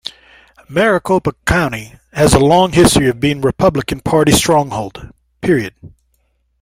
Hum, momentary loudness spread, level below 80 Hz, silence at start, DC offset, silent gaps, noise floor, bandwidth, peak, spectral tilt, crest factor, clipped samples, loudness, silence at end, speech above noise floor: none; 14 LU; -34 dBFS; 0.05 s; under 0.1%; none; -62 dBFS; 16 kHz; 0 dBFS; -5 dB/octave; 14 dB; under 0.1%; -13 LUFS; 0.75 s; 48 dB